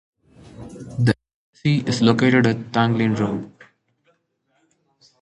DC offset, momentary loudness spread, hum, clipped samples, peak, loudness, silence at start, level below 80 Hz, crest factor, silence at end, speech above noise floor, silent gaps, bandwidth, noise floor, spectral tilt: under 0.1%; 22 LU; none; under 0.1%; 0 dBFS; -20 LUFS; 0.6 s; -54 dBFS; 22 dB; 1.75 s; 50 dB; 1.34-1.53 s; 11 kHz; -68 dBFS; -6.5 dB/octave